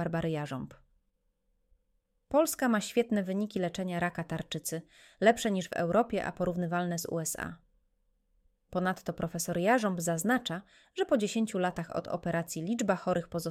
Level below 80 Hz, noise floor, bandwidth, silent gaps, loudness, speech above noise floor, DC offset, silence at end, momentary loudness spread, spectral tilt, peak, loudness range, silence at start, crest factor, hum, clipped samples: -62 dBFS; -76 dBFS; 16.5 kHz; none; -32 LUFS; 45 dB; under 0.1%; 0 s; 10 LU; -5 dB/octave; -10 dBFS; 3 LU; 0 s; 22 dB; none; under 0.1%